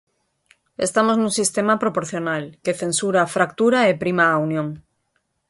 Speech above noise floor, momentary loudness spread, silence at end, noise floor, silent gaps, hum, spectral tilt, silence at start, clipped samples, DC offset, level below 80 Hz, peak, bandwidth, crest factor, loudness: 51 dB; 9 LU; 0.7 s; -71 dBFS; none; none; -4 dB/octave; 0.8 s; under 0.1%; under 0.1%; -62 dBFS; -4 dBFS; 11.5 kHz; 18 dB; -20 LUFS